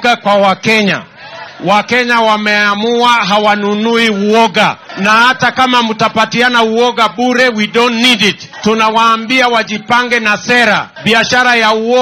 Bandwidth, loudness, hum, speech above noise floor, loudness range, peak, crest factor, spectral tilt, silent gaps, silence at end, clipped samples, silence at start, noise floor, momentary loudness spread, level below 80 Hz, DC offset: 16 kHz; -10 LUFS; none; 19 dB; 1 LU; 0 dBFS; 10 dB; -3.5 dB/octave; none; 0 s; 0.1%; 0 s; -30 dBFS; 5 LU; -52 dBFS; under 0.1%